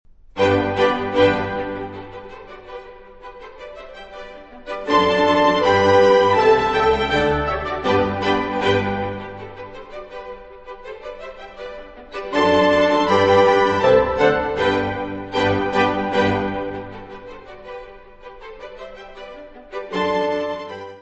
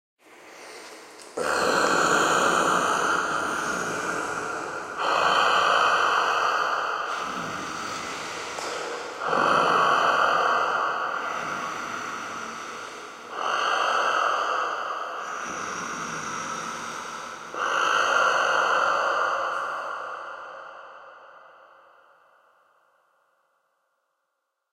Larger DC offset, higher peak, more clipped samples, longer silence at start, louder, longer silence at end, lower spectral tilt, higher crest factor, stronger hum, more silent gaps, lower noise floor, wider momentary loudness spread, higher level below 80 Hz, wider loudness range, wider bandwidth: first, 0.1% vs under 0.1%; first, -2 dBFS vs -8 dBFS; neither; about the same, 0.35 s vs 0.3 s; first, -18 LUFS vs -24 LUFS; second, 0 s vs 3.2 s; first, -5.5 dB/octave vs -2 dB/octave; about the same, 18 dB vs 18 dB; neither; neither; second, -40 dBFS vs -79 dBFS; first, 22 LU vs 16 LU; first, -44 dBFS vs -66 dBFS; first, 15 LU vs 7 LU; second, 8.4 kHz vs 16 kHz